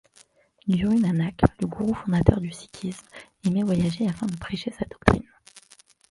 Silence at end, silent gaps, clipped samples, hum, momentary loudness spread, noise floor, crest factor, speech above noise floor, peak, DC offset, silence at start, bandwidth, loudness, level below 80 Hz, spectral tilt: 0.5 s; none; under 0.1%; none; 13 LU; -58 dBFS; 24 dB; 35 dB; 0 dBFS; under 0.1%; 0.65 s; 11.5 kHz; -25 LUFS; -40 dBFS; -7.5 dB/octave